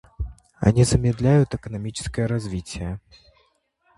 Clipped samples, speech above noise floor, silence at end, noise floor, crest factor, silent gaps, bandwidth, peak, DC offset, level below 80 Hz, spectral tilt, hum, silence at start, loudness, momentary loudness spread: under 0.1%; 44 dB; 1 s; -65 dBFS; 22 dB; none; 11.5 kHz; -2 dBFS; under 0.1%; -38 dBFS; -6.5 dB/octave; none; 0.2 s; -22 LUFS; 17 LU